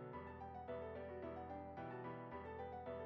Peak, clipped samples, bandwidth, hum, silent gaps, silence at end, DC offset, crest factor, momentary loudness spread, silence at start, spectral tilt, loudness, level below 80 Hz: -38 dBFS; under 0.1%; 6.4 kHz; none; none; 0 s; under 0.1%; 12 dB; 3 LU; 0 s; -6.5 dB/octave; -51 LUFS; -68 dBFS